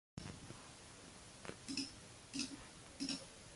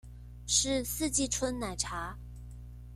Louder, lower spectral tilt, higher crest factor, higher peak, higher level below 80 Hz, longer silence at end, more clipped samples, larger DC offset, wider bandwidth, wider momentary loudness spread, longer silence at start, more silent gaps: second, -48 LUFS vs -31 LUFS; about the same, -3 dB/octave vs -2.5 dB/octave; about the same, 22 dB vs 20 dB; second, -28 dBFS vs -14 dBFS; second, -68 dBFS vs -46 dBFS; about the same, 0 s vs 0 s; neither; neither; second, 11.5 kHz vs 16.5 kHz; second, 12 LU vs 21 LU; about the same, 0.15 s vs 0.05 s; neither